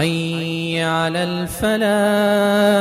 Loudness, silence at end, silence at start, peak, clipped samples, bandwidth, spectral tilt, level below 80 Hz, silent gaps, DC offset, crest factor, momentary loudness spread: -18 LUFS; 0 s; 0 s; -4 dBFS; under 0.1%; 16 kHz; -5 dB/octave; -46 dBFS; none; under 0.1%; 14 dB; 7 LU